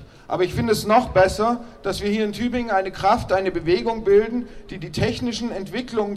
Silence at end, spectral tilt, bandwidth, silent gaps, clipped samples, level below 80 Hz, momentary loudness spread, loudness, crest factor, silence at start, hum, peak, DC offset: 0 s; -5.5 dB/octave; 14 kHz; none; under 0.1%; -42 dBFS; 11 LU; -21 LUFS; 18 dB; 0 s; none; -4 dBFS; under 0.1%